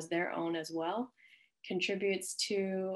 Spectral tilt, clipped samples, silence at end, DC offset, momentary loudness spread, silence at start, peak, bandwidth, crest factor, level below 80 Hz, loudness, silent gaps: -3.5 dB/octave; under 0.1%; 0 s; under 0.1%; 7 LU; 0 s; -22 dBFS; 13 kHz; 14 dB; -86 dBFS; -36 LUFS; none